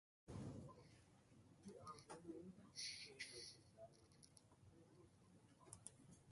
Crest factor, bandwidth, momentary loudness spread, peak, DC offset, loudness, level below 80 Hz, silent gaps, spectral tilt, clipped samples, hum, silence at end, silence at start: 24 dB; 11.5 kHz; 17 LU; -36 dBFS; under 0.1%; -57 LUFS; -78 dBFS; none; -3.5 dB/octave; under 0.1%; none; 0 s; 0.25 s